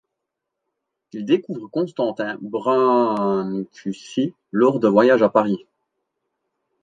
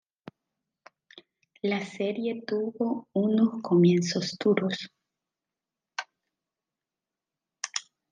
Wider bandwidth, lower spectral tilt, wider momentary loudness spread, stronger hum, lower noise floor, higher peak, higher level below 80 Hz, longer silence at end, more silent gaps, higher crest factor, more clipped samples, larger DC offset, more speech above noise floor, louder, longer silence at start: about the same, 9 kHz vs 9.6 kHz; first, -7 dB/octave vs -5.5 dB/octave; second, 13 LU vs 16 LU; neither; second, -81 dBFS vs -90 dBFS; first, -2 dBFS vs -10 dBFS; first, -70 dBFS vs -80 dBFS; first, 1.25 s vs 0.3 s; neither; about the same, 18 dB vs 20 dB; neither; neither; about the same, 62 dB vs 64 dB; first, -20 LUFS vs -27 LUFS; second, 1.15 s vs 1.65 s